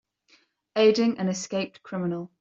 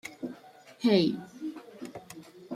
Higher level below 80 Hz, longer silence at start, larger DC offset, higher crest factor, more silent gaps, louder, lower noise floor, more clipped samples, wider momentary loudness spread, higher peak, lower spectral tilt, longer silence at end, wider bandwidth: about the same, -72 dBFS vs -74 dBFS; first, 0.75 s vs 0.05 s; neither; about the same, 18 dB vs 22 dB; neither; first, -25 LUFS vs -29 LUFS; first, -63 dBFS vs -53 dBFS; neither; second, 12 LU vs 23 LU; about the same, -8 dBFS vs -10 dBFS; about the same, -5 dB/octave vs -6 dB/octave; first, 0.15 s vs 0 s; second, 7.8 kHz vs 14.5 kHz